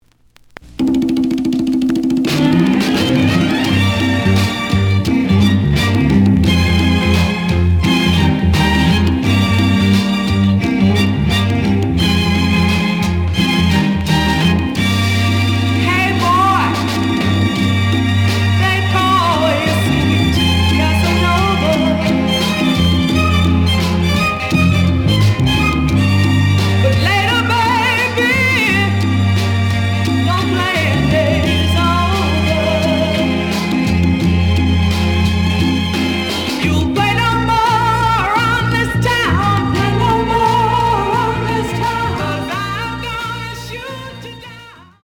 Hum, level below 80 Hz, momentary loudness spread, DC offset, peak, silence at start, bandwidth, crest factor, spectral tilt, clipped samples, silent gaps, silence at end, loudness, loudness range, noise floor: none; -32 dBFS; 4 LU; under 0.1%; 0 dBFS; 0.65 s; 17.5 kHz; 12 dB; -6 dB/octave; under 0.1%; none; 0.35 s; -14 LUFS; 2 LU; -49 dBFS